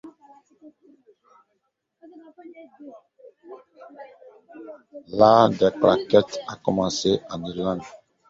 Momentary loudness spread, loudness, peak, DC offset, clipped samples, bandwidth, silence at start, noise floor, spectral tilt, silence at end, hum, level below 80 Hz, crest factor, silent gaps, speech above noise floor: 28 LU; -21 LUFS; -2 dBFS; under 0.1%; under 0.1%; 8 kHz; 0.05 s; -75 dBFS; -5.5 dB/octave; 0.35 s; none; -58 dBFS; 24 dB; none; 54 dB